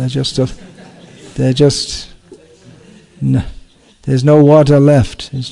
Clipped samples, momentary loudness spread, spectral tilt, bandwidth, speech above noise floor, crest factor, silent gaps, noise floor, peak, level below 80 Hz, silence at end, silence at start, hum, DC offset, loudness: 0.7%; 19 LU; -6.5 dB/octave; 11 kHz; 30 dB; 14 dB; none; -41 dBFS; 0 dBFS; -36 dBFS; 0 s; 0 s; none; under 0.1%; -12 LUFS